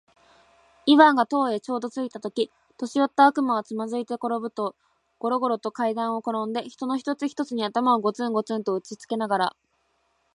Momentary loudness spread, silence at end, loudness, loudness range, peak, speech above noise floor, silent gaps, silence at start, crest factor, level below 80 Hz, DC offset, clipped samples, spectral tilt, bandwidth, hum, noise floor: 12 LU; 0.85 s; -24 LUFS; 6 LU; -2 dBFS; 46 dB; none; 0.85 s; 24 dB; -78 dBFS; under 0.1%; under 0.1%; -5 dB/octave; 11 kHz; none; -70 dBFS